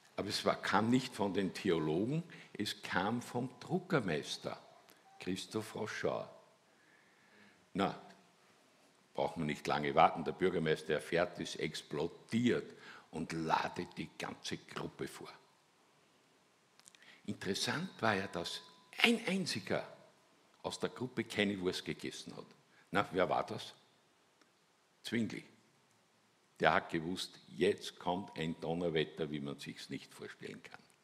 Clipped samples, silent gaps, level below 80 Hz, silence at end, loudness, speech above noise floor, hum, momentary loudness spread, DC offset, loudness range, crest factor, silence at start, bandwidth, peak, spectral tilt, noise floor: under 0.1%; none; -72 dBFS; 0.3 s; -37 LUFS; 35 dB; none; 16 LU; under 0.1%; 8 LU; 28 dB; 0.15 s; 15.5 kHz; -10 dBFS; -5 dB/octave; -72 dBFS